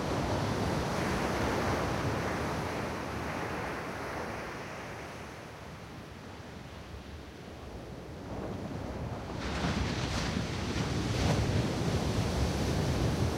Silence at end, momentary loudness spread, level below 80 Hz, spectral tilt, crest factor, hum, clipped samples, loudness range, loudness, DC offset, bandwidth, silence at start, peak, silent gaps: 0 s; 15 LU; -44 dBFS; -5.5 dB/octave; 16 dB; none; under 0.1%; 12 LU; -34 LUFS; under 0.1%; 16 kHz; 0 s; -18 dBFS; none